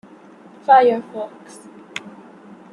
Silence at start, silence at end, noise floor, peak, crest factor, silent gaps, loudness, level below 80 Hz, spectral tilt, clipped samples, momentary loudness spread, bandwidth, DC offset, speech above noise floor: 0.7 s; 0.65 s; -44 dBFS; -2 dBFS; 20 dB; none; -16 LUFS; -76 dBFS; -4.5 dB/octave; under 0.1%; 24 LU; 11 kHz; under 0.1%; 28 dB